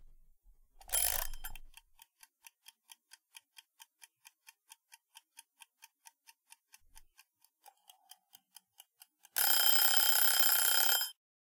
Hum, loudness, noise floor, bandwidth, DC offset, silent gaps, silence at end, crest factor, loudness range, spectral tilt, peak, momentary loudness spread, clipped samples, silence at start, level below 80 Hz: none; -27 LUFS; -69 dBFS; 19 kHz; under 0.1%; none; 0.4 s; 24 dB; 16 LU; 2.5 dB/octave; -12 dBFS; 16 LU; under 0.1%; 0.9 s; -56 dBFS